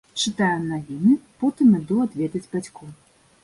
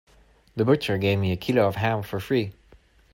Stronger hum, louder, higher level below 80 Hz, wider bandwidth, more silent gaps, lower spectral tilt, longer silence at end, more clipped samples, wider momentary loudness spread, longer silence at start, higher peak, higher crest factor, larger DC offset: neither; about the same, -22 LUFS vs -24 LUFS; about the same, -60 dBFS vs -56 dBFS; second, 11.5 kHz vs 16.5 kHz; neither; second, -5.5 dB/octave vs -7 dB/octave; about the same, 0.5 s vs 0.6 s; neither; first, 12 LU vs 7 LU; second, 0.15 s vs 0.55 s; about the same, -6 dBFS vs -8 dBFS; about the same, 16 dB vs 18 dB; neither